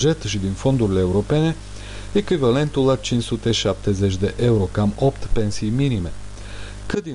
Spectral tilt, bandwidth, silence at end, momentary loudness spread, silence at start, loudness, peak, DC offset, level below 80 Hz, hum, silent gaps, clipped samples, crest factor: -6 dB/octave; 11 kHz; 0 s; 14 LU; 0 s; -20 LUFS; -8 dBFS; 0.6%; -34 dBFS; 50 Hz at -35 dBFS; none; under 0.1%; 12 dB